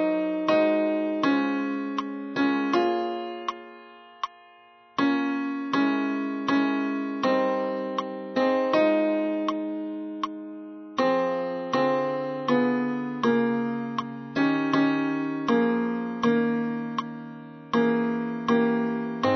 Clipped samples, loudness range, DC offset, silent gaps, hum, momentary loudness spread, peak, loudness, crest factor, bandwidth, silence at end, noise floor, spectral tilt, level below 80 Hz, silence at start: under 0.1%; 3 LU; under 0.1%; none; none; 10 LU; -10 dBFS; -26 LUFS; 16 dB; 6.4 kHz; 0 s; -54 dBFS; -6.5 dB/octave; -72 dBFS; 0 s